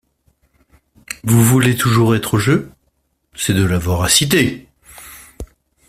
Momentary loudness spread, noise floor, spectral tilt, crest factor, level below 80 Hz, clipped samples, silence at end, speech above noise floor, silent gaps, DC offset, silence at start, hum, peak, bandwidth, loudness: 24 LU; -65 dBFS; -4.5 dB/octave; 18 dB; -42 dBFS; under 0.1%; 0.45 s; 51 dB; none; under 0.1%; 1.1 s; none; 0 dBFS; 16 kHz; -15 LUFS